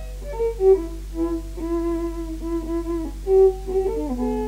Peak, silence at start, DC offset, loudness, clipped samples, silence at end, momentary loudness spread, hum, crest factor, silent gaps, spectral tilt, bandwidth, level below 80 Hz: -6 dBFS; 0 s; under 0.1%; -23 LUFS; under 0.1%; 0 s; 12 LU; none; 16 dB; none; -8 dB/octave; 15.5 kHz; -32 dBFS